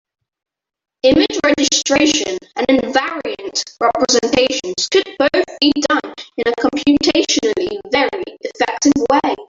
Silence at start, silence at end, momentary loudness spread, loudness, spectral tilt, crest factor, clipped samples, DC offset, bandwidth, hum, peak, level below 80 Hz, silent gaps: 1.05 s; 0.05 s; 8 LU; -15 LUFS; -2.5 dB/octave; 16 dB; under 0.1%; under 0.1%; 7.8 kHz; none; 0 dBFS; -48 dBFS; none